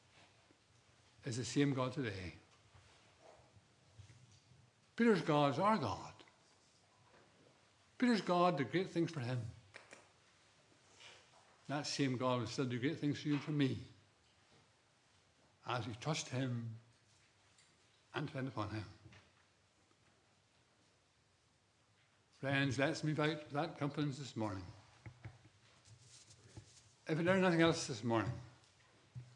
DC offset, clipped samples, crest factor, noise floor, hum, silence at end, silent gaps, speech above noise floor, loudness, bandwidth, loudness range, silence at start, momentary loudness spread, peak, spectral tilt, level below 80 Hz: under 0.1%; under 0.1%; 26 dB; -74 dBFS; none; 0.05 s; none; 37 dB; -38 LUFS; 11 kHz; 10 LU; 1.25 s; 25 LU; -16 dBFS; -5.5 dB/octave; -80 dBFS